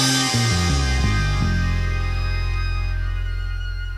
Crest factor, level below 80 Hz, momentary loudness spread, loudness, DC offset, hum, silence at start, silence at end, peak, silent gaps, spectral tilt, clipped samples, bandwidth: 14 dB; -24 dBFS; 9 LU; -22 LUFS; under 0.1%; none; 0 s; 0 s; -6 dBFS; none; -4 dB/octave; under 0.1%; 13.5 kHz